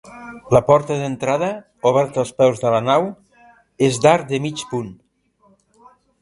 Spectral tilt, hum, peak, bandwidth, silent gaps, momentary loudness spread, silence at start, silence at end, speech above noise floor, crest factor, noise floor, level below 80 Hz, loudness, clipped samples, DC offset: -5.5 dB/octave; none; 0 dBFS; 11.5 kHz; none; 13 LU; 0.05 s; 1.3 s; 41 dB; 18 dB; -58 dBFS; -54 dBFS; -18 LUFS; under 0.1%; under 0.1%